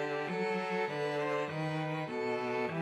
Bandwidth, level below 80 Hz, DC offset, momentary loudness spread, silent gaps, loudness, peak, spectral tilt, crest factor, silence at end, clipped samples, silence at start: 12 kHz; -80 dBFS; under 0.1%; 2 LU; none; -35 LUFS; -22 dBFS; -6.5 dB/octave; 12 dB; 0 s; under 0.1%; 0 s